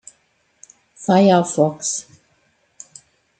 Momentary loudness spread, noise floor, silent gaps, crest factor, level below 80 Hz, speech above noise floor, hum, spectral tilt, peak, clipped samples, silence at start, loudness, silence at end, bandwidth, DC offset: 27 LU; -63 dBFS; none; 18 dB; -68 dBFS; 47 dB; none; -5 dB/octave; -2 dBFS; under 0.1%; 1 s; -17 LUFS; 1.4 s; 9.4 kHz; under 0.1%